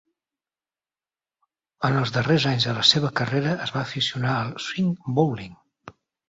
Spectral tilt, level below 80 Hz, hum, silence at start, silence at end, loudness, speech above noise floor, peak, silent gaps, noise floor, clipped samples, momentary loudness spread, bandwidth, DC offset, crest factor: -5 dB/octave; -58 dBFS; none; 1.8 s; 0.4 s; -23 LUFS; over 67 dB; -2 dBFS; none; under -90 dBFS; under 0.1%; 10 LU; 8 kHz; under 0.1%; 24 dB